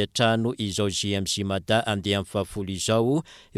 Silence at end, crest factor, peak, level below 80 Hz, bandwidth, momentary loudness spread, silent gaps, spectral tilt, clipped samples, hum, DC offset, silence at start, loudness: 0.15 s; 18 dB; -8 dBFS; -54 dBFS; 15 kHz; 6 LU; none; -4.5 dB/octave; under 0.1%; none; under 0.1%; 0 s; -25 LUFS